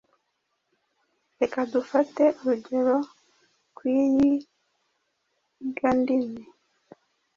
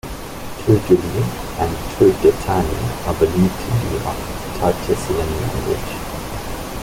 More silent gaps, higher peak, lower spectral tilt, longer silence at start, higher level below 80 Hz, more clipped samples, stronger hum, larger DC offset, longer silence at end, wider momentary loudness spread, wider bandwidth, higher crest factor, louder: neither; second, -10 dBFS vs -2 dBFS; about the same, -6.5 dB/octave vs -6.5 dB/octave; first, 1.4 s vs 0.05 s; second, -64 dBFS vs -32 dBFS; neither; neither; neither; first, 0.95 s vs 0 s; about the same, 13 LU vs 12 LU; second, 7.2 kHz vs 17 kHz; about the same, 18 dB vs 18 dB; second, -25 LUFS vs -19 LUFS